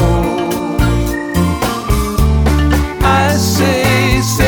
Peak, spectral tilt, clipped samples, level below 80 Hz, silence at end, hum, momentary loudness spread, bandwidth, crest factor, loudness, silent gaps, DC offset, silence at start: 0 dBFS; -5.5 dB/octave; under 0.1%; -18 dBFS; 0 s; none; 5 LU; over 20 kHz; 12 dB; -13 LUFS; none; under 0.1%; 0 s